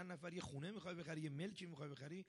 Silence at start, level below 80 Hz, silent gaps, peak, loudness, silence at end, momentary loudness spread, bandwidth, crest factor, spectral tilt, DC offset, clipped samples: 0 s; -78 dBFS; none; -36 dBFS; -50 LUFS; 0 s; 4 LU; 11.5 kHz; 14 dB; -6 dB/octave; under 0.1%; under 0.1%